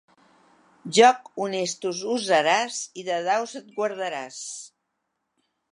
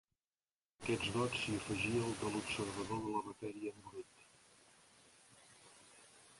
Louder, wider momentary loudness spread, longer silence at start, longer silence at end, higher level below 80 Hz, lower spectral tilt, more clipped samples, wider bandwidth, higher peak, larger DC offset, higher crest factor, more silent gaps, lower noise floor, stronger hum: first, -24 LUFS vs -40 LUFS; second, 17 LU vs 23 LU; about the same, 0.85 s vs 0.8 s; first, 1.1 s vs 0 s; second, -82 dBFS vs -66 dBFS; second, -2.5 dB/octave vs -4.5 dB/octave; neither; about the same, 11 kHz vs 11.5 kHz; first, -2 dBFS vs -24 dBFS; neither; about the same, 22 dB vs 18 dB; neither; second, -78 dBFS vs under -90 dBFS; neither